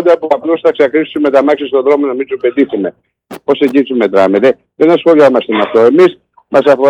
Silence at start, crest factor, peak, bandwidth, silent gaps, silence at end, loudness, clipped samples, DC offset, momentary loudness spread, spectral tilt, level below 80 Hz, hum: 0 s; 10 dB; 0 dBFS; 11.5 kHz; none; 0 s; -10 LUFS; under 0.1%; under 0.1%; 7 LU; -6.5 dB/octave; -60 dBFS; none